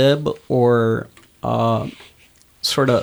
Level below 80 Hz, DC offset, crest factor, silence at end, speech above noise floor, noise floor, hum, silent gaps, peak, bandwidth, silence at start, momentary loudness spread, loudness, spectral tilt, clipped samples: -52 dBFS; under 0.1%; 14 dB; 0 s; 35 dB; -52 dBFS; none; none; -4 dBFS; over 20 kHz; 0 s; 12 LU; -19 LUFS; -6 dB/octave; under 0.1%